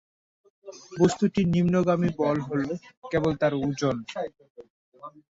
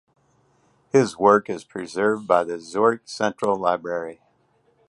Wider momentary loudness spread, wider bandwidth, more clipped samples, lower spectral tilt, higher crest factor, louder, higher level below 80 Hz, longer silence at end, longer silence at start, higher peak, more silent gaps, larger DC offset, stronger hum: first, 23 LU vs 13 LU; second, 8 kHz vs 11.5 kHz; neither; first, -7 dB/octave vs -5.5 dB/octave; about the same, 18 dB vs 20 dB; second, -26 LUFS vs -22 LUFS; first, -54 dBFS vs -66 dBFS; second, 0.2 s vs 0.75 s; second, 0.65 s vs 0.95 s; second, -8 dBFS vs -2 dBFS; first, 2.97-3.02 s, 4.50-4.55 s, 4.70-4.92 s vs none; neither; neither